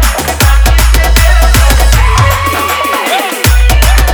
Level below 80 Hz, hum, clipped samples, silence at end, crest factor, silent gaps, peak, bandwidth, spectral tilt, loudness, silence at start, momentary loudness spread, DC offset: -8 dBFS; none; 0.3%; 0 s; 6 dB; none; 0 dBFS; over 20 kHz; -3.5 dB/octave; -8 LUFS; 0 s; 4 LU; under 0.1%